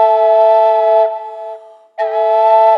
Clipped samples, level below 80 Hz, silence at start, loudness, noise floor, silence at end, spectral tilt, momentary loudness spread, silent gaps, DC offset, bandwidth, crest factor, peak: under 0.1%; under -90 dBFS; 0 s; -11 LUFS; -33 dBFS; 0 s; -0.5 dB/octave; 17 LU; none; under 0.1%; 5.6 kHz; 10 dB; -2 dBFS